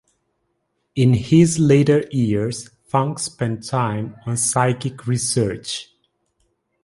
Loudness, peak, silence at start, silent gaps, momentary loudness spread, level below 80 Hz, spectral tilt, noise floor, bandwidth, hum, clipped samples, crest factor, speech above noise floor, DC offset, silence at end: -19 LUFS; -2 dBFS; 0.95 s; none; 13 LU; -50 dBFS; -5.5 dB/octave; -71 dBFS; 11.5 kHz; none; under 0.1%; 18 dB; 53 dB; under 0.1%; 1 s